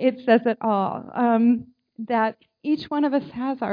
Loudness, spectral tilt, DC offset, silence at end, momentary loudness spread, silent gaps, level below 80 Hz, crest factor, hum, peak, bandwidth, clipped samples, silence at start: -23 LUFS; -8.5 dB/octave; under 0.1%; 0 s; 8 LU; none; -68 dBFS; 18 dB; none; -6 dBFS; 5.2 kHz; under 0.1%; 0 s